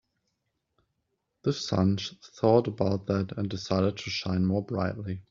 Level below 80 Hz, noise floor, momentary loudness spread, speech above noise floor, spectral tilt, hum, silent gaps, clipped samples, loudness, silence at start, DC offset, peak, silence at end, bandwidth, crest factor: -62 dBFS; -79 dBFS; 9 LU; 52 dB; -6.5 dB/octave; none; none; under 0.1%; -28 LUFS; 1.45 s; under 0.1%; -8 dBFS; 0.1 s; 7.6 kHz; 22 dB